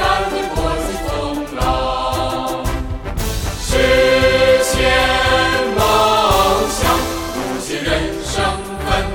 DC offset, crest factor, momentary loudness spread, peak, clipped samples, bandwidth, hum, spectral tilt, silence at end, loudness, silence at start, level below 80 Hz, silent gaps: under 0.1%; 14 dB; 10 LU; -2 dBFS; under 0.1%; 17.5 kHz; none; -4 dB/octave; 0 s; -16 LUFS; 0 s; -26 dBFS; none